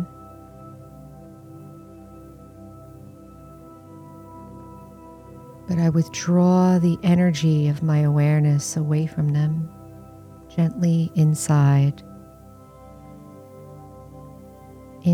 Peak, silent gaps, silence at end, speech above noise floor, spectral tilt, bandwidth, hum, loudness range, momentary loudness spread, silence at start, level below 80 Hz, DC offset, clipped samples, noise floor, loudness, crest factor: -10 dBFS; none; 0 s; 27 dB; -7 dB/octave; 13.5 kHz; none; 24 LU; 25 LU; 0 s; -54 dBFS; under 0.1%; under 0.1%; -45 dBFS; -20 LUFS; 14 dB